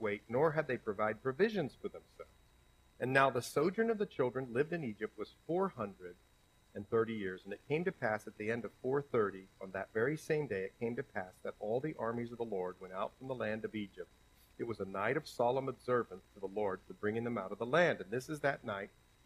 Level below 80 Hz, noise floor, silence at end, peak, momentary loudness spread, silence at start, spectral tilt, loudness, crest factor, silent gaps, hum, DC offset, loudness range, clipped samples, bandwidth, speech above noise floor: -70 dBFS; -67 dBFS; 0.4 s; -14 dBFS; 13 LU; 0 s; -6 dB/octave; -37 LUFS; 24 dB; none; none; under 0.1%; 5 LU; under 0.1%; 15 kHz; 29 dB